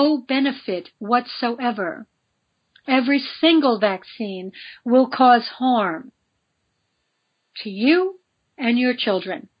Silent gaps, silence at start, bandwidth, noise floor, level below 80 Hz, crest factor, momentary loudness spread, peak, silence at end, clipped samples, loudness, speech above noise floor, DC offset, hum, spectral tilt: none; 0 s; 5.2 kHz; -72 dBFS; -78 dBFS; 20 dB; 17 LU; -2 dBFS; 0.2 s; under 0.1%; -20 LUFS; 53 dB; under 0.1%; none; -8 dB/octave